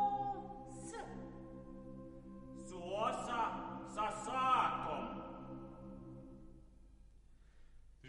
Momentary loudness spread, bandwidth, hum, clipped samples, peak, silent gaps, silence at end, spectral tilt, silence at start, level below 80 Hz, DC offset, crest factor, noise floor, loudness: 19 LU; 11 kHz; none; under 0.1%; -22 dBFS; none; 0 s; -4.5 dB/octave; 0 s; -60 dBFS; under 0.1%; 22 dB; -62 dBFS; -41 LUFS